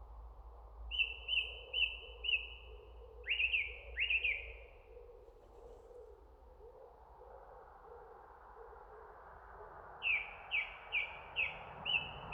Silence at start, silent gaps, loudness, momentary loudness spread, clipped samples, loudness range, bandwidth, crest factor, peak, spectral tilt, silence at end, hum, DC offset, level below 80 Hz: 0 s; none; -37 LUFS; 24 LU; under 0.1%; 21 LU; 9.4 kHz; 20 dB; -22 dBFS; -3.5 dB/octave; 0 s; none; under 0.1%; -58 dBFS